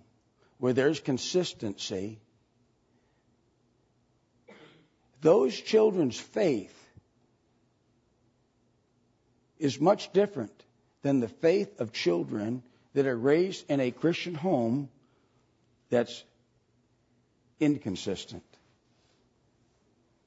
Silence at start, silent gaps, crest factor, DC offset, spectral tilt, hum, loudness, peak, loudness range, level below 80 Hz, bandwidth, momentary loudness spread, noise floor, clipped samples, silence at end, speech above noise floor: 0.6 s; none; 22 dB; under 0.1%; -5.5 dB/octave; none; -29 LUFS; -10 dBFS; 8 LU; -74 dBFS; 8 kHz; 13 LU; -70 dBFS; under 0.1%; 1.85 s; 43 dB